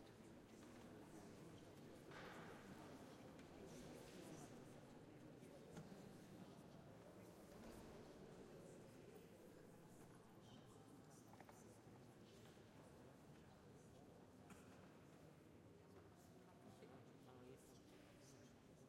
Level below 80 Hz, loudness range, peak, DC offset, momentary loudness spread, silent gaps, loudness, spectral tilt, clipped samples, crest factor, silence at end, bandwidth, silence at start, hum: -80 dBFS; 5 LU; -46 dBFS; under 0.1%; 7 LU; none; -63 LUFS; -5.5 dB/octave; under 0.1%; 18 dB; 0 s; 16 kHz; 0 s; none